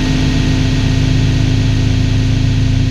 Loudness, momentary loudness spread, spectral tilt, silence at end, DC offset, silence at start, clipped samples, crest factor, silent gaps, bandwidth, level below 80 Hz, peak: -14 LUFS; 1 LU; -6 dB/octave; 0 s; 0.9%; 0 s; under 0.1%; 10 dB; none; 8.8 kHz; -18 dBFS; 0 dBFS